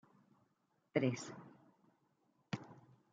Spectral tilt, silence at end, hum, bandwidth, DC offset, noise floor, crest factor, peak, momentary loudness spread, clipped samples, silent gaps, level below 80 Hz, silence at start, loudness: -6 dB/octave; 0.35 s; none; 8.8 kHz; under 0.1%; -81 dBFS; 26 dB; -20 dBFS; 22 LU; under 0.1%; none; -88 dBFS; 0.95 s; -42 LUFS